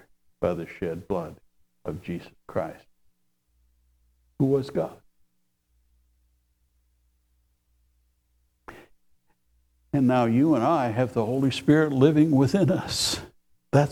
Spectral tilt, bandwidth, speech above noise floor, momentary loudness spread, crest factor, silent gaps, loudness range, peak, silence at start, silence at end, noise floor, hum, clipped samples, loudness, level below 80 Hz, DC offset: -6 dB/octave; 15.5 kHz; 48 dB; 15 LU; 22 dB; none; 14 LU; -6 dBFS; 0.4 s; 0 s; -71 dBFS; none; under 0.1%; -24 LUFS; -56 dBFS; under 0.1%